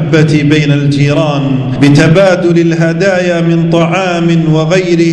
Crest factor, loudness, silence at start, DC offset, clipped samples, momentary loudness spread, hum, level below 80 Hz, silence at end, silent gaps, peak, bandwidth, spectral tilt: 8 dB; -9 LUFS; 0 s; under 0.1%; 2%; 4 LU; none; -40 dBFS; 0 s; none; 0 dBFS; 10 kHz; -7 dB/octave